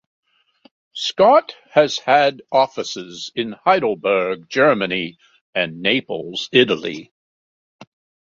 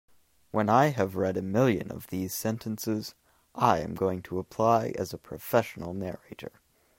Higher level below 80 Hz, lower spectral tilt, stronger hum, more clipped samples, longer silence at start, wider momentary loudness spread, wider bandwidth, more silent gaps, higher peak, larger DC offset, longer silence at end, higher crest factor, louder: about the same, -64 dBFS vs -62 dBFS; second, -4 dB/octave vs -6 dB/octave; neither; neither; first, 0.95 s vs 0.55 s; second, 12 LU vs 15 LU; second, 7.8 kHz vs 16.5 kHz; first, 5.41-5.53 s, 7.11-7.79 s vs none; first, -2 dBFS vs -8 dBFS; neither; about the same, 0.45 s vs 0.5 s; about the same, 18 dB vs 22 dB; first, -18 LUFS vs -28 LUFS